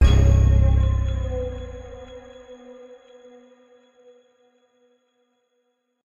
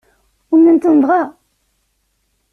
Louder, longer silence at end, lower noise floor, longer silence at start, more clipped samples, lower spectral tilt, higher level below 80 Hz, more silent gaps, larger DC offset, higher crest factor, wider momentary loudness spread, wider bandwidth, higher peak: second, -20 LUFS vs -12 LUFS; first, 3.3 s vs 1.2 s; first, -72 dBFS vs -65 dBFS; second, 0 s vs 0.5 s; neither; about the same, -7.5 dB/octave vs -8 dB/octave; first, -24 dBFS vs -62 dBFS; neither; neither; first, 18 dB vs 12 dB; first, 27 LU vs 7 LU; first, 7.2 kHz vs 2.8 kHz; second, -6 dBFS vs -2 dBFS